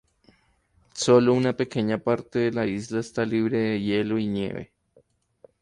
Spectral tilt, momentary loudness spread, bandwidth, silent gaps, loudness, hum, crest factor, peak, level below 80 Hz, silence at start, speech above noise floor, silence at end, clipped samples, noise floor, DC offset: -6 dB/octave; 11 LU; 11 kHz; none; -24 LUFS; none; 18 dB; -8 dBFS; -60 dBFS; 0.95 s; 41 dB; 0.95 s; under 0.1%; -64 dBFS; under 0.1%